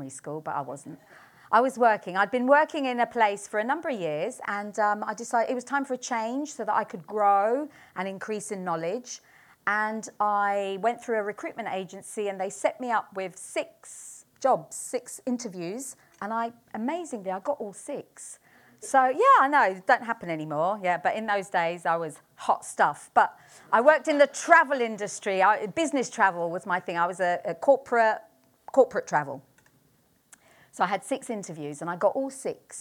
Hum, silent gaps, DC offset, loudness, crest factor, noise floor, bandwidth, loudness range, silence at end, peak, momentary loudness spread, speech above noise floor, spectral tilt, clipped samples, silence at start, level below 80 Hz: none; none; under 0.1%; -26 LUFS; 24 dB; -65 dBFS; 18.5 kHz; 9 LU; 0 s; -4 dBFS; 14 LU; 39 dB; -4 dB/octave; under 0.1%; 0 s; -78 dBFS